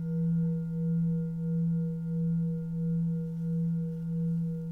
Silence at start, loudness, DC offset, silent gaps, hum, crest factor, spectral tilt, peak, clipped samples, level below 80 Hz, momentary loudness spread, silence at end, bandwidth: 0 s; -31 LUFS; under 0.1%; none; none; 8 dB; -12 dB/octave; -24 dBFS; under 0.1%; -56 dBFS; 4 LU; 0 s; 1.5 kHz